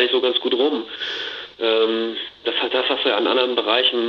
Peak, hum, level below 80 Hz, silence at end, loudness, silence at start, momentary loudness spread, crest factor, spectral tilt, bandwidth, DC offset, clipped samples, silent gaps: -2 dBFS; none; -66 dBFS; 0 s; -20 LUFS; 0 s; 9 LU; 18 dB; -4 dB/octave; 6.8 kHz; under 0.1%; under 0.1%; none